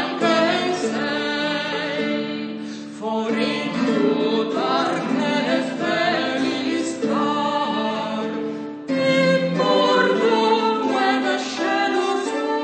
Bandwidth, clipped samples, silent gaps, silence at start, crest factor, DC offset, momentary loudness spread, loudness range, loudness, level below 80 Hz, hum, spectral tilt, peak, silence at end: 9.2 kHz; under 0.1%; none; 0 s; 16 dB; under 0.1%; 8 LU; 4 LU; -21 LUFS; -72 dBFS; none; -4.5 dB/octave; -4 dBFS; 0 s